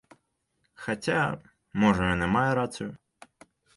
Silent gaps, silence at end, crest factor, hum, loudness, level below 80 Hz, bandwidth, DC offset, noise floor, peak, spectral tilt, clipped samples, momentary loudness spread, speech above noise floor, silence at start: none; 0.8 s; 20 dB; none; -27 LUFS; -50 dBFS; 11.5 kHz; under 0.1%; -75 dBFS; -10 dBFS; -6 dB/octave; under 0.1%; 15 LU; 49 dB; 0.8 s